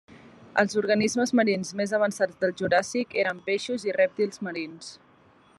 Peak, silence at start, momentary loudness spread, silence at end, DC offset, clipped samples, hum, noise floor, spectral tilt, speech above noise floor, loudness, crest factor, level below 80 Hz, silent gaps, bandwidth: -6 dBFS; 0.1 s; 10 LU; 0.65 s; under 0.1%; under 0.1%; none; -58 dBFS; -4.5 dB/octave; 32 dB; -26 LUFS; 20 dB; -70 dBFS; none; 12.5 kHz